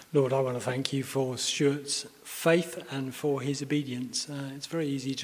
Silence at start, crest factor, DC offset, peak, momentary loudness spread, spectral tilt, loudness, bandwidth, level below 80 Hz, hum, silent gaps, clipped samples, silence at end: 0 s; 24 dB; under 0.1%; -6 dBFS; 10 LU; -4.5 dB/octave; -30 LUFS; 16 kHz; -72 dBFS; none; none; under 0.1%; 0 s